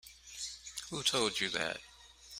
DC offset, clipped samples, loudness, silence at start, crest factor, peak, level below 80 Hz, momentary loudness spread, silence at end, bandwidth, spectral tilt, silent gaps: under 0.1%; under 0.1%; -35 LUFS; 0.05 s; 22 dB; -16 dBFS; -66 dBFS; 19 LU; 0 s; 16 kHz; -1.5 dB/octave; none